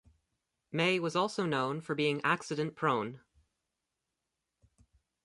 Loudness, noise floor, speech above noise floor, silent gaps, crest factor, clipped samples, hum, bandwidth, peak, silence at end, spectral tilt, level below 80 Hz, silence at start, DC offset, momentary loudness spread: -32 LUFS; -87 dBFS; 55 dB; none; 20 dB; under 0.1%; none; 11.5 kHz; -14 dBFS; 2.05 s; -5 dB/octave; -74 dBFS; 0.75 s; under 0.1%; 6 LU